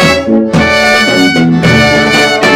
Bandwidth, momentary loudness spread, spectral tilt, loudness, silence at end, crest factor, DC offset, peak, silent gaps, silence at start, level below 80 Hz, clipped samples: 17 kHz; 2 LU; -4.5 dB/octave; -7 LUFS; 0 s; 8 dB; under 0.1%; 0 dBFS; none; 0 s; -32 dBFS; 0.8%